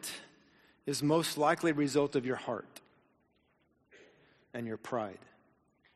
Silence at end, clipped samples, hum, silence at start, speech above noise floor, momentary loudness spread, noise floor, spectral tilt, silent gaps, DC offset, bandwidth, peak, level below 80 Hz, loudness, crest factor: 0.8 s; under 0.1%; none; 0 s; 41 dB; 15 LU; -73 dBFS; -4.5 dB/octave; none; under 0.1%; 13 kHz; -16 dBFS; -76 dBFS; -33 LUFS; 20 dB